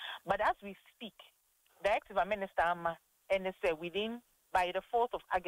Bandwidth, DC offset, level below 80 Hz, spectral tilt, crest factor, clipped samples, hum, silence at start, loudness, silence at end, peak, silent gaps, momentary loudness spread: 16 kHz; under 0.1%; -62 dBFS; -4.5 dB/octave; 16 dB; under 0.1%; none; 0 s; -35 LUFS; 0 s; -20 dBFS; none; 16 LU